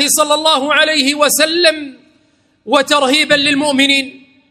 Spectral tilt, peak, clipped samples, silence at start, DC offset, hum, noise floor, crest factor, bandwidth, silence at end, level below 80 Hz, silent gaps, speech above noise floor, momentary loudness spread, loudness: -1 dB/octave; 0 dBFS; 0.1%; 0 s; under 0.1%; none; -55 dBFS; 14 dB; 16.5 kHz; 0.35 s; -62 dBFS; none; 43 dB; 5 LU; -11 LUFS